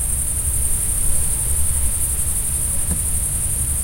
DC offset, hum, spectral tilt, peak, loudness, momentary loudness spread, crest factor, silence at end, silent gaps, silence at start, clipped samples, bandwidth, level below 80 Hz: under 0.1%; none; -2.5 dB/octave; -4 dBFS; -18 LUFS; 1 LU; 14 dB; 0 s; none; 0 s; under 0.1%; 16.5 kHz; -26 dBFS